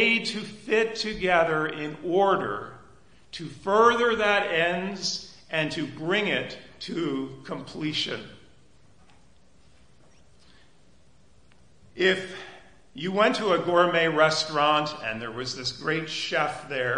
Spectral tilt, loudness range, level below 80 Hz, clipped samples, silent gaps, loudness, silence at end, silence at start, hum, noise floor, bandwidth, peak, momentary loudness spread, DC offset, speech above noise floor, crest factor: -4 dB/octave; 10 LU; -60 dBFS; under 0.1%; none; -25 LUFS; 0 s; 0 s; none; -60 dBFS; 10.5 kHz; -6 dBFS; 15 LU; 0.2%; 34 dB; 22 dB